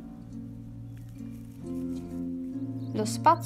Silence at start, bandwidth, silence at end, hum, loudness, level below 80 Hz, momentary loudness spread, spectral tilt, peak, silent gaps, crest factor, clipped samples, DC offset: 0 s; 15.5 kHz; 0 s; none; -34 LUFS; -54 dBFS; 15 LU; -6 dB/octave; -8 dBFS; none; 24 dB; under 0.1%; under 0.1%